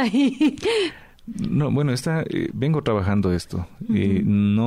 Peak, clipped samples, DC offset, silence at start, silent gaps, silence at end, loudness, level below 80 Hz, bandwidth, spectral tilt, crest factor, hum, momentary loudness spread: -12 dBFS; under 0.1%; under 0.1%; 0 s; none; 0 s; -22 LUFS; -46 dBFS; 13.5 kHz; -7 dB/octave; 10 dB; none; 10 LU